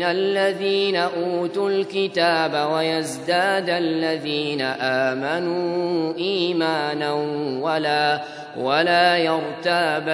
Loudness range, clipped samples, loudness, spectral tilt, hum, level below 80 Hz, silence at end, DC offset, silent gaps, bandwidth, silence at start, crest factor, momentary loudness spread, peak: 2 LU; under 0.1%; -21 LUFS; -4.5 dB/octave; none; -72 dBFS; 0 s; under 0.1%; none; 11 kHz; 0 s; 18 dB; 5 LU; -2 dBFS